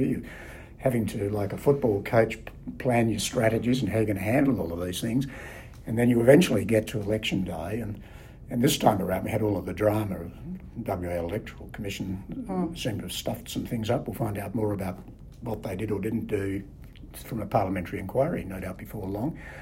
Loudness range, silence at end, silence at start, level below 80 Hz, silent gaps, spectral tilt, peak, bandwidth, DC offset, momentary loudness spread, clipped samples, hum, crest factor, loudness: 8 LU; 0 s; 0 s; -48 dBFS; none; -6 dB/octave; -6 dBFS; 16 kHz; under 0.1%; 15 LU; under 0.1%; none; 22 dB; -27 LUFS